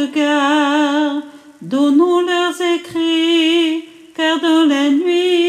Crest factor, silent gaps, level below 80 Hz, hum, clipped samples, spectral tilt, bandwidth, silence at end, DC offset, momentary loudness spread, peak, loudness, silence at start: 12 dB; none; -70 dBFS; none; under 0.1%; -3 dB/octave; 14 kHz; 0 s; under 0.1%; 8 LU; -2 dBFS; -15 LUFS; 0 s